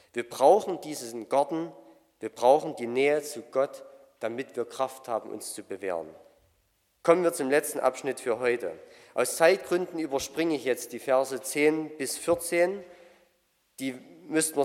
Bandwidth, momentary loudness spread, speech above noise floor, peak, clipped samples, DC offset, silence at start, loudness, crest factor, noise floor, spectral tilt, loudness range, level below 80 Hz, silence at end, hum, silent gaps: 16.5 kHz; 14 LU; 43 dB; -6 dBFS; under 0.1%; under 0.1%; 0.15 s; -28 LUFS; 22 dB; -71 dBFS; -3.5 dB/octave; 5 LU; -72 dBFS; 0 s; none; none